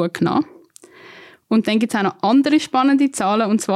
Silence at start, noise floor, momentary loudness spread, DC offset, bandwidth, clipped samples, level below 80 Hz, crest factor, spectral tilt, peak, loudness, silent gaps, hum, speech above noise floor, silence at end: 0 s; -45 dBFS; 5 LU; under 0.1%; 13 kHz; under 0.1%; -64 dBFS; 12 dB; -5 dB/octave; -6 dBFS; -18 LUFS; none; none; 28 dB; 0 s